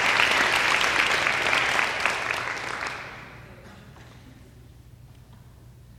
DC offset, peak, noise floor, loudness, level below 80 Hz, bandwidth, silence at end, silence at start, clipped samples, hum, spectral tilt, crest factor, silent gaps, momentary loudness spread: under 0.1%; -6 dBFS; -49 dBFS; -22 LUFS; -54 dBFS; 18 kHz; 0.05 s; 0 s; under 0.1%; none; -1.5 dB/octave; 22 dB; none; 16 LU